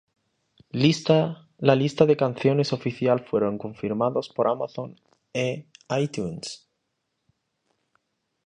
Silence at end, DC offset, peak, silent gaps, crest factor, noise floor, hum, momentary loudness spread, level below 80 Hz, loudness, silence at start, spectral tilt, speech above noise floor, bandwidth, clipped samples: 1.9 s; under 0.1%; -2 dBFS; none; 24 dB; -78 dBFS; none; 15 LU; -64 dBFS; -24 LUFS; 0.75 s; -6.5 dB/octave; 54 dB; 10 kHz; under 0.1%